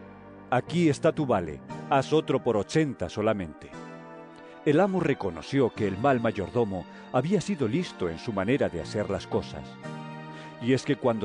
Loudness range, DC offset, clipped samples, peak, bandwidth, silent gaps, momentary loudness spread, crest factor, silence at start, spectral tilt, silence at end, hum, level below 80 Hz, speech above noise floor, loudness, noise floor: 3 LU; under 0.1%; under 0.1%; -10 dBFS; 10 kHz; none; 17 LU; 16 dB; 0 s; -6.5 dB/octave; 0 s; none; -58 dBFS; 20 dB; -27 LUFS; -46 dBFS